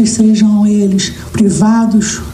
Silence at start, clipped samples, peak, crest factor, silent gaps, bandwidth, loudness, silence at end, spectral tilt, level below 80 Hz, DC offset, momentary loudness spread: 0 s; under 0.1%; 0 dBFS; 10 dB; none; 11.5 kHz; -10 LUFS; 0 s; -5 dB/octave; -36 dBFS; under 0.1%; 5 LU